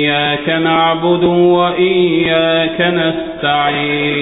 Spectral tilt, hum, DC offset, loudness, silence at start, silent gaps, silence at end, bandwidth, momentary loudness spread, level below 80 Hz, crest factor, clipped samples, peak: -3 dB/octave; none; under 0.1%; -13 LUFS; 0 s; none; 0 s; 4 kHz; 4 LU; -44 dBFS; 12 dB; under 0.1%; 0 dBFS